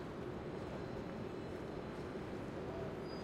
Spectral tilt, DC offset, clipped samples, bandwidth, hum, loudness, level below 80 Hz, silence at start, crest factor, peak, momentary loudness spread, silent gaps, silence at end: -7 dB/octave; under 0.1%; under 0.1%; 15.5 kHz; none; -46 LUFS; -60 dBFS; 0 s; 12 dB; -32 dBFS; 1 LU; none; 0 s